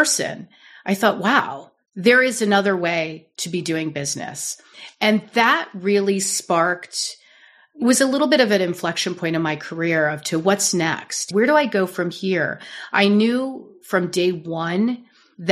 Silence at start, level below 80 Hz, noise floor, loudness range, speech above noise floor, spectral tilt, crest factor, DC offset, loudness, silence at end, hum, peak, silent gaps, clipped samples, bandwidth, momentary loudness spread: 0 s; -70 dBFS; -52 dBFS; 2 LU; 32 dB; -3.5 dB/octave; 18 dB; under 0.1%; -20 LUFS; 0 s; none; -2 dBFS; none; under 0.1%; 14 kHz; 12 LU